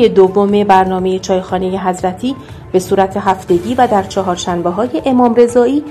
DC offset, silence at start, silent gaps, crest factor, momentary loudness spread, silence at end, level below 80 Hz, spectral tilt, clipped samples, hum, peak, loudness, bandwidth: under 0.1%; 0 s; none; 12 dB; 8 LU; 0 s; -42 dBFS; -6 dB/octave; 0.2%; none; 0 dBFS; -13 LUFS; 13.5 kHz